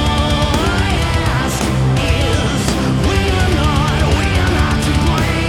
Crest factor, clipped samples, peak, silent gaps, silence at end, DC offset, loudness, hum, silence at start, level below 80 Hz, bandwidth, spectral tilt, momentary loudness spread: 14 dB; under 0.1%; 0 dBFS; none; 0 s; under 0.1%; -15 LUFS; none; 0 s; -20 dBFS; 16 kHz; -5 dB/octave; 2 LU